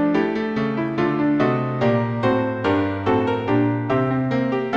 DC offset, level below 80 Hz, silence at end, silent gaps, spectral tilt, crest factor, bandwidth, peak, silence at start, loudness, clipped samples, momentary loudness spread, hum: 0.1%; -52 dBFS; 0 s; none; -8.5 dB/octave; 14 dB; 7 kHz; -6 dBFS; 0 s; -21 LUFS; under 0.1%; 3 LU; none